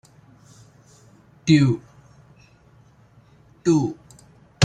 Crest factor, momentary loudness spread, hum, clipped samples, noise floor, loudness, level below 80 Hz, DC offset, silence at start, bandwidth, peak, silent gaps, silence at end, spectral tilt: 22 dB; 13 LU; none; under 0.1%; -53 dBFS; -21 LUFS; -58 dBFS; under 0.1%; 1.45 s; 9.4 kHz; -4 dBFS; none; 0 s; -6 dB/octave